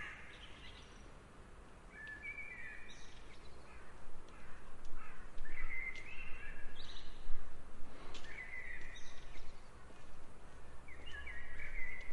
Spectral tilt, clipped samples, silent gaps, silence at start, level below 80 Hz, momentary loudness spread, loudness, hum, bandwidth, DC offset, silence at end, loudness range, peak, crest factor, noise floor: -4 dB/octave; under 0.1%; none; 0 s; -48 dBFS; 13 LU; -51 LUFS; none; 7 kHz; under 0.1%; 0 s; 3 LU; -18 dBFS; 18 dB; -56 dBFS